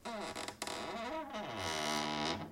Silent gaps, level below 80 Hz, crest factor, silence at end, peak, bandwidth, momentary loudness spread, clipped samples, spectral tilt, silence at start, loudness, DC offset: none; -68 dBFS; 18 dB; 0 s; -22 dBFS; 16.5 kHz; 7 LU; under 0.1%; -3 dB/octave; 0 s; -39 LUFS; under 0.1%